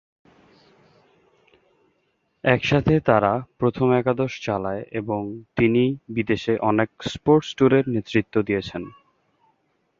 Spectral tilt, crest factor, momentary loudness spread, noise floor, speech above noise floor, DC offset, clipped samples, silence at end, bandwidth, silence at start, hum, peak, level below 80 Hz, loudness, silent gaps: -7 dB/octave; 22 dB; 10 LU; -69 dBFS; 48 dB; under 0.1%; under 0.1%; 1.1 s; 7.6 kHz; 2.45 s; none; -2 dBFS; -50 dBFS; -22 LUFS; none